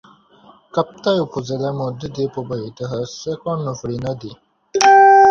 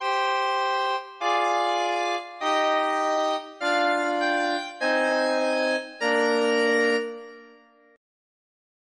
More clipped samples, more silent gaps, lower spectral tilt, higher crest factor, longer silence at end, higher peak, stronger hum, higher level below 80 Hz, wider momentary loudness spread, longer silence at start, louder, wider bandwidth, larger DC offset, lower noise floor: neither; neither; first, -4.5 dB/octave vs -2 dB/octave; about the same, 18 dB vs 14 dB; second, 0 s vs 1.5 s; first, 0 dBFS vs -10 dBFS; neither; first, -54 dBFS vs -82 dBFS; first, 16 LU vs 6 LU; first, 0.75 s vs 0 s; first, -18 LUFS vs -24 LUFS; second, 7.4 kHz vs 10.5 kHz; neither; second, -49 dBFS vs -54 dBFS